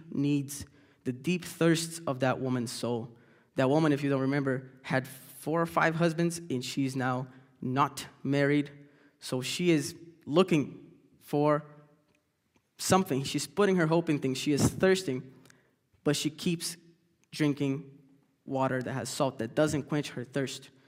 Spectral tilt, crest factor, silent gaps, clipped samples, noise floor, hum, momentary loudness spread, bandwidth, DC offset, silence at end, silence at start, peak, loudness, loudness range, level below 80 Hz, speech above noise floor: -5.5 dB/octave; 22 dB; none; under 0.1%; -73 dBFS; none; 12 LU; 16 kHz; under 0.1%; 0.2 s; 0 s; -8 dBFS; -30 LUFS; 4 LU; -64 dBFS; 44 dB